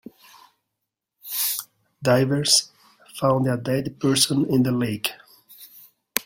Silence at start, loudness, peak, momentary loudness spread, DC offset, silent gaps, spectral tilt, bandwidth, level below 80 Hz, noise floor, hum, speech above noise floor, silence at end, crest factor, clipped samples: 1.25 s; -22 LUFS; 0 dBFS; 12 LU; under 0.1%; none; -4 dB/octave; 16.5 kHz; -60 dBFS; -82 dBFS; none; 61 dB; 0.05 s; 24 dB; under 0.1%